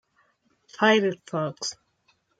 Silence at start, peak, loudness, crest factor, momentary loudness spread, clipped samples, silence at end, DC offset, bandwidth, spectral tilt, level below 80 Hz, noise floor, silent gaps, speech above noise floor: 0.8 s; -6 dBFS; -25 LUFS; 22 dB; 13 LU; under 0.1%; 0.65 s; under 0.1%; 9.4 kHz; -4 dB/octave; -78 dBFS; -68 dBFS; none; 44 dB